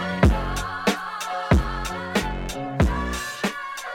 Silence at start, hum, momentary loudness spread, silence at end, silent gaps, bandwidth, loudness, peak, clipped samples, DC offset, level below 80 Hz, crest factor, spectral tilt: 0 s; none; 9 LU; 0 s; none; 17 kHz; -25 LUFS; -4 dBFS; under 0.1%; under 0.1%; -28 dBFS; 18 dB; -5.5 dB/octave